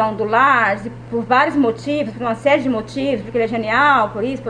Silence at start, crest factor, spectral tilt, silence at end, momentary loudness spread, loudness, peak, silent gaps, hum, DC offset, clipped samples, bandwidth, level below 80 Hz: 0 s; 18 dB; -6 dB/octave; 0 s; 9 LU; -17 LUFS; 0 dBFS; none; none; under 0.1%; under 0.1%; 10 kHz; -48 dBFS